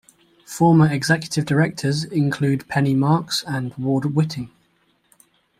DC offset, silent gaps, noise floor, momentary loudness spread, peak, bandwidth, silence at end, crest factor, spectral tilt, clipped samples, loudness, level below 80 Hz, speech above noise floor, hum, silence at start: under 0.1%; none; -63 dBFS; 9 LU; -4 dBFS; 15 kHz; 1.15 s; 16 dB; -6 dB/octave; under 0.1%; -20 LUFS; -58 dBFS; 44 dB; none; 0.5 s